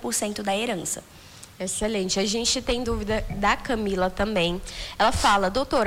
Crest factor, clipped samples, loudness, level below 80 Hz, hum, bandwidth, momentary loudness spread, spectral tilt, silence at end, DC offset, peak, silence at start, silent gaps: 16 dB; under 0.1%; -25 LUFS; -40 dBFS; none; 19 kHz; 11 LU; -3 dB/octave; 0 s; under 0.1%; -10 dBFS; 0 s; none